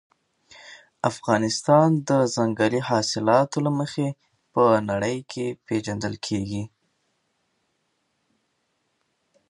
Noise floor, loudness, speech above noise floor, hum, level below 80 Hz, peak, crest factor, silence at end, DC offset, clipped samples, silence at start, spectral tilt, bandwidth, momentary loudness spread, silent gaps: -73 dBFS; -23 LUFS; 50 dB; none; -60 dBFS; -4 dBFS; 20 dB; 2.8 s; under 0.1%; under 0.1%; 0.6 s; -5.5 dB/octave; 11 kHz; 11 LU; none